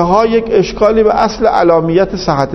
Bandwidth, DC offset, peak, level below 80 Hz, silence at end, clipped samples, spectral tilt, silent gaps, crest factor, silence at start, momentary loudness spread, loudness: 6.2 kHz; under 0.1%; 0 dBFS; -34 dBFS; 0 s; 0.2%; -6.5 dB/octave; none; 10 dB; 0 s; 4 LU; -11 LUFS